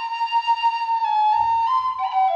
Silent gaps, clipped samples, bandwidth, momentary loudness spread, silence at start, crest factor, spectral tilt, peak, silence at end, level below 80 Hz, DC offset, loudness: none; under 0.1%; 7.4 kHz; 4 LU; 0 s; 10 dB; -1.5 dB/octave; -10 dBFS; 0 s; -60 dBFS; under 0.1%; -20 LUFS